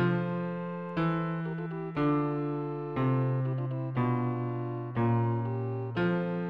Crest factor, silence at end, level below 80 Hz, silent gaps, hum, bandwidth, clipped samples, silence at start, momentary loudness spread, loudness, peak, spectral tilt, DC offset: 12 dB; 0 s; -60 dBFS; none; none; 5.2 kHz; under 0.1%; 0 s; 7 LU; -31 LUFS; -18 dBFS; -10.5 dB/octave; under 0.1%